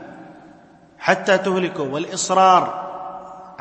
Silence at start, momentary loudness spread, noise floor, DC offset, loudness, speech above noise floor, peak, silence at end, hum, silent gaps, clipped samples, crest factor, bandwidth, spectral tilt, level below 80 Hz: 0 s; 21 LU; -48 dBFS; under 0.1%; -18 LUFS; 30 dB; 0 dBFS; 0.05 s; none; none; under 0.1%; 20 dB; 8.8 kHz; -3.5 dB/octave; -66 dBFS